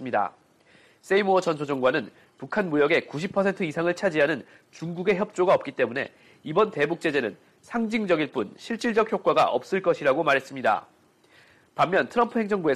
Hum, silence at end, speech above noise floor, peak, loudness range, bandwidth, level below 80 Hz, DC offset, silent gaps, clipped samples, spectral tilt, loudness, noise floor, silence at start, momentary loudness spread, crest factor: none; 0 s; 33 dB; -8 dBFS; 2 LU; 13 kHz; -66 dBFS; under 0.1%; none; under 0.1%; -5.5 dB/octave; -25 LUFS; -58 dBFS; 0 s; 11 LU; 16 dB